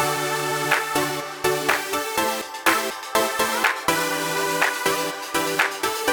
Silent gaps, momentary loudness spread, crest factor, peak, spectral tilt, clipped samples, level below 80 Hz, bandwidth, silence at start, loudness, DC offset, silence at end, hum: none; 4 LU; 22 dB; -2 dBFS; -2 dB/octave; under 0.1%; -58 dBFS; over 20 kHz; 0 s; -22 LUFS; under 0.1%; 0 s; none